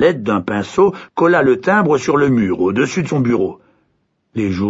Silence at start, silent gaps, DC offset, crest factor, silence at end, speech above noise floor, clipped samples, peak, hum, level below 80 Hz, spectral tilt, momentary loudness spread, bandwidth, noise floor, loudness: 0 s; none; under 0.1%; 14 dB; 0 s; 50 dB; under 0.1%; -2 dBFS; none; -50 dBFS; -6.5 dB/octave; 7 LU; 8 kHz; -64 dBFS; -15 LUFS